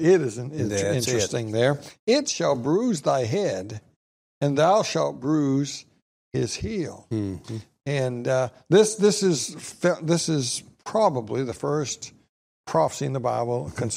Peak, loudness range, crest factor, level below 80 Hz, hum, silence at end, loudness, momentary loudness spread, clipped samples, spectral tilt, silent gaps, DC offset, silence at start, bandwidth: -6 dBFS; 4 LU; 18 dB; -56 dBFS; none; 0 s; -24 LUFS; 11 LU; under 0.1%; -5 dB/octave; 1.99-2.07 s, 3.96-4.41 s, 6.02-6.31 s, 12.29-12.64 s; under 0.1%; 0 s; 15.5 kHz